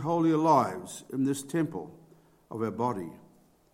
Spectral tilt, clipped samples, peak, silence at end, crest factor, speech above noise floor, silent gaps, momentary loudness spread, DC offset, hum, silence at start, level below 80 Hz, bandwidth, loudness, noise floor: -6.5 dB/octave; under 0.1%; -10 dBFS; 0.55 s; 20 dB; 31 dB; none; 18 LU; under 0.1%; none; 0 s; -72 dBFS; 16 kHz; -29 LUFS; -59 dBFS